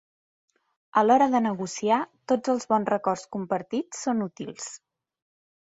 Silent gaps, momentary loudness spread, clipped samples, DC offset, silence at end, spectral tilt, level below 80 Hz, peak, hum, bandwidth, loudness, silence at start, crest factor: none; 14 LU; under 0.1%; under 0.1%; 1 s; -5 dB/octave; -70 dBFS; -6 dBFS; none; 8.2 kHz; -25 LUFS; 0.95 s; 20 dB